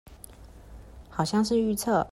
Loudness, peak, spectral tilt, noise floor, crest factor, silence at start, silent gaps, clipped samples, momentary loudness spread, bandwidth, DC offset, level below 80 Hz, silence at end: -26 LUFS; -12 dBFS; -5 dB/octave; -48 dBFS; 16 dB; 0.1 s; none; under 0.1%; 23 LU; 15 kHz; under 0.1%; -50 dBFS; 0 s